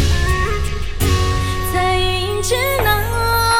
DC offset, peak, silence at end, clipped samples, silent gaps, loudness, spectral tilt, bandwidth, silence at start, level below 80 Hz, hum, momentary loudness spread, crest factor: under 0.1%; -4 dBFS; 0 s; under 0.1%; none; -17 LUFS; -4 dB/octave; 17.5 kHz; 0 s; -22 dBFS; none; 5 LU; 14 dB